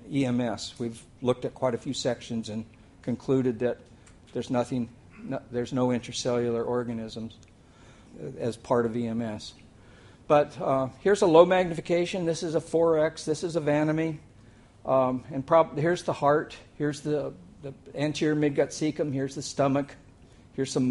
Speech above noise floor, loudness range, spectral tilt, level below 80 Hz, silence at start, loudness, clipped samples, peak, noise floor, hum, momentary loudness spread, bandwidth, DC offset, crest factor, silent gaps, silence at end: 27 dB; 7 LU; -6 dB/octave; -58 dBFS; 0.05 s; -27 LUFS; under 0.1%; -4 dBFS; -53 dBFS; none; 15 LU; 11.5 kHz; under 0.1%; 22 dB; none; 0 s